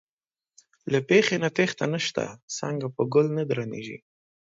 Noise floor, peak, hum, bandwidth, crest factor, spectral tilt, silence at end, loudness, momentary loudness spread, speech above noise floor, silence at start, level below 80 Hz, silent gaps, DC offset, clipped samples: under -90 dBFS; -8 dBFS; none; 7.8 kHz; 20 dB; -5 dB/octave; 0.55 s; -25 LUFS; 15 LU; over 65 dB; 0.85 s; -70 dBFS; 2.43-2.48 s; under 0.1%; under 0.1%